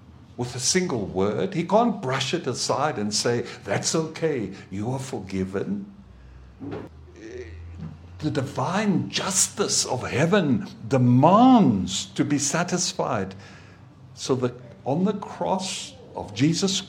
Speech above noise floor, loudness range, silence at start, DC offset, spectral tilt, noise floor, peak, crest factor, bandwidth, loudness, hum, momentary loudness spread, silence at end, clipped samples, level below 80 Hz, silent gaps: 24 dB; 12 LU; 0.1 s; under 0.1%; -4.5 dB/octave; -47 dBFS; -2 dBFS; 22 dB; 16 kHz; -23 LUFS; none; 17 LU; 0 s; under 0.1%; -56 dBFS; none